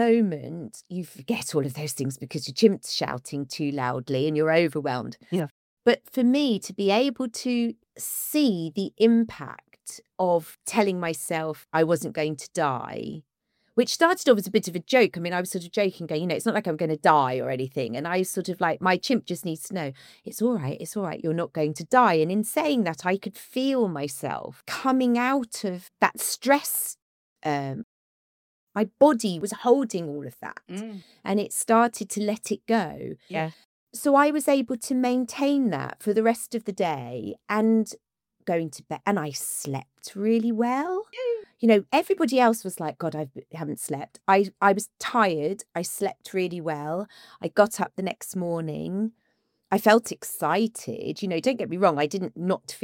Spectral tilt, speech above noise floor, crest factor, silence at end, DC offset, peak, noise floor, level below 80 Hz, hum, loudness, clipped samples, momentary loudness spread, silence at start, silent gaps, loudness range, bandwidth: -5 dB/octave; 48 dB; 20 dB; 0.05 s; under 0.1%; -4 dBFS; -73 dBFS; -72 dBFS; none; -25 LUFS; under 0.1%; 13 LU; 0 s; 5.51-5.77 s, 27.02-27.36 s, 27.83-28.67 s, 33.65-33.87 s; 3 LU; 17 kHz